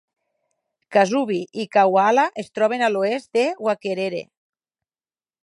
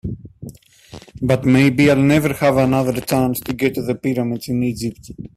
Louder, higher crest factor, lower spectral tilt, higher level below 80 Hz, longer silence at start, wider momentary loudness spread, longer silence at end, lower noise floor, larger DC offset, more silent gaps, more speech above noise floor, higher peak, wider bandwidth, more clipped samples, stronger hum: second, -20 LUFS vs -17 LUFS; about the same, 18 dB vs 16 dB; second, -5 dB/octave vs -6.5 dB/octave; second, -78 dBFS vs -44 dBFS; first, 0.9 s vs 0.05 s; second, 9 LU vs 19 LU; first, 1.2 s vs 0.1 s; first, under -90 dBFS vs -41 dBFS; neither; neither; first, over 70 dB vs 24 dB; about the same, -4 dBFS vs -2 dBFS; second, 11.5 kHz vs 16 kHz; neither; neither